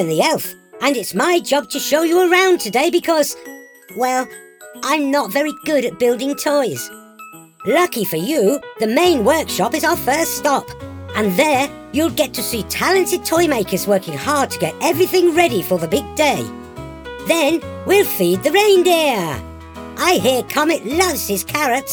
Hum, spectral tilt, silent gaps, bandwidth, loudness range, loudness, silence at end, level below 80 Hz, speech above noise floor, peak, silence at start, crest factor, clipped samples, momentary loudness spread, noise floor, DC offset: none; -3.5 dB/octave; none; over 20 kHz; 3 LU; -17 LUFS; 0 s; -50 dBFS; 23 dB; 0 dBFS; 0 s; 16 dB; under 0.1%; 14 LU; -39 dBFS; under 0.1%